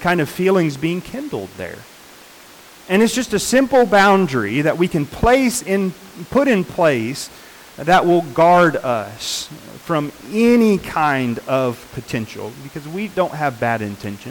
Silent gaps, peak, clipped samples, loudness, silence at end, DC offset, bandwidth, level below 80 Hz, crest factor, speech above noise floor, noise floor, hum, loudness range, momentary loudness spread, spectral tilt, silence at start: none; -6 dBFS; under 0.1%; -17 LUFS; 0 s; under 0.1%; 19 kHz; -42 dBFS; 12 dB; 25 dB; -42 dBFS; none; 5 LU; 16 LU; -5 dB/octave; 0 s